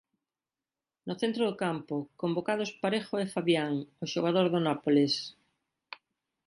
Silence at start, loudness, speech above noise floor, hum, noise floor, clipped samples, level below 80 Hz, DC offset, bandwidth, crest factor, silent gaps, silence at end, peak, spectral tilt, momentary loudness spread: 1.05 s; -30 LUFS; over 60 dB; none; under -90 dBFS; under 0.1%; -76 dBFS; under 0.1%; 11.5 kHz; 18 dB; none; 0.5 s; -12 dBFS; -5.5 dB/octave; 18 LU